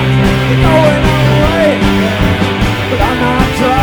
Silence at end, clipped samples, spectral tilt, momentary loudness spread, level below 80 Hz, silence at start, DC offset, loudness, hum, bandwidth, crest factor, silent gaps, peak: 0 s; 0.2%; -6.5 dB/octave; 4 LU; -20 dBFS; 0 s; under 0.1%; -10 LUFS; none; over 20 kHz; 10 dB; none; 0 dBFS